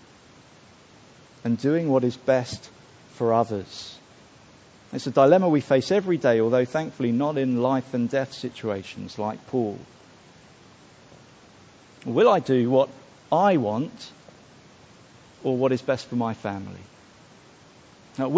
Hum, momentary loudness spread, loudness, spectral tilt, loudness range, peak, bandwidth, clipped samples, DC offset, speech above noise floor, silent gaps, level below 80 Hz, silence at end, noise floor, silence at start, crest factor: none; 17 LU; -24 LUFS; -7 dB/octave; 8 LU; -4 dBFS; 8 kHz; under 0.1%; under 0.1%; 29 dB; none; -62 dBFS; 0 s; -52 dBFS; 1.45 s; 22 dB